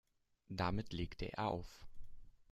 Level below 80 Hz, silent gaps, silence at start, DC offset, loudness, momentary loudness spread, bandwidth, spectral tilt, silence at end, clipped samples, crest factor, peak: -56 dBFS; none; 0.5 s; under 0.1%; -43 LUFS; 19 LU; 13 kHz; -6.5 dB/octave; 0.1 s; under 0.1%; 20 dB; -24 dBFS